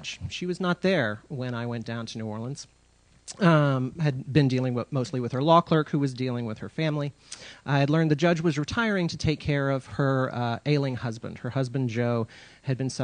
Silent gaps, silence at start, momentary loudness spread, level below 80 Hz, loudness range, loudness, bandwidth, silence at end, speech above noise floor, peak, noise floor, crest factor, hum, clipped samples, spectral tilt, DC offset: none; 0 s; 12 LU; -54 dBFS; 4 LU; -26 LUFS; 10 kHz; 0 s; 28 dB; -6 dBFS; -54 dBFS; 20 dB; none; under 0.1%; -6.5 dB/octave; under 0.1%